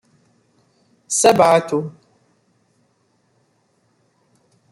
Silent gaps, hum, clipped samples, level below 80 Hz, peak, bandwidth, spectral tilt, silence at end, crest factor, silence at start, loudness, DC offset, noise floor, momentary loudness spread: none; none; under 0.1%; -64 dBFS; -2 dBFS; 16 kHz; -3.5 dB/octave; 2.8 s; 20 dB; 1.1 s; -15 LUFS; under 0.1%; -63 dBFS; 12 LU